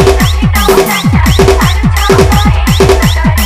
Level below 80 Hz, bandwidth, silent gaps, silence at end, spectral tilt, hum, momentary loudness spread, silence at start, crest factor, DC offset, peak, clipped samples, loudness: -12 dBFS; 16.5 kHz; none; 0 s; -5.5 dB/octave; none; 2 LU; 0 s; 6 dB; under 0.1%; 0 dBFS; 0.7%; -8 LUFS